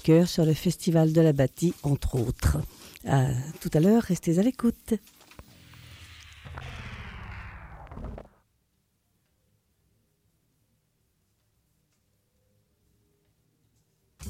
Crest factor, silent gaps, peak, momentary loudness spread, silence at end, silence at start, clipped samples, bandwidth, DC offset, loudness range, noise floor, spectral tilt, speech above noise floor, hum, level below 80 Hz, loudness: 18 dB; none; -10 dBFS; 23 LU; 0 s; 0.05 s; under 0.1%; 16 kHz; under 0.1%; 20 LU; -73 dBFS; -7 dB/octave; 49 dB; none; -44 dBFS; -25 LUFS